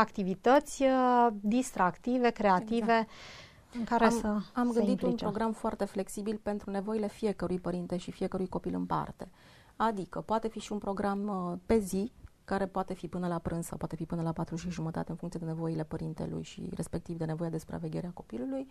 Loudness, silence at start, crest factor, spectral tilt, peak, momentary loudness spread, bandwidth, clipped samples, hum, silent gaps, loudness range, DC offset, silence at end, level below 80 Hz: -32 LUFS; 0 s; 22 dB; -6.5 dB/octave; -10 dBFS; 12 LU; 14.5 kHz; under 0.1%; none; none; 8 LU; under 0.1%; 0 s; -54 dBFS